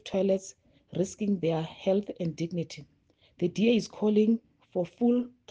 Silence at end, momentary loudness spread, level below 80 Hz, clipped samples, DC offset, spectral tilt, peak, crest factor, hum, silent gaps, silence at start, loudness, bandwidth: 0.2 s; 11 LU; -68 dBFS; under 0.1%; under 0.1%; -6.5 dB/octave; -14 dBFS; 16 dB; none; none; 0.05 s; -29 LUFS; 9.4 kHz